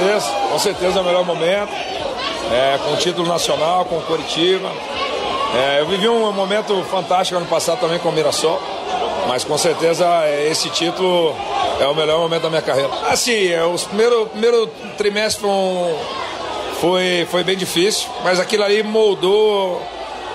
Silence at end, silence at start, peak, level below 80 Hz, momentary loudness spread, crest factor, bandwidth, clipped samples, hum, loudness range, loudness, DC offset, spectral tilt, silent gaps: 0 s; 0 s; -4 dBFS; -52 dBFS; 7 LU; 12 dB; 16 kHz; under 0.1%; none; 2 LU; -17 LUFS; under 0.1%; -3 dB/octave; none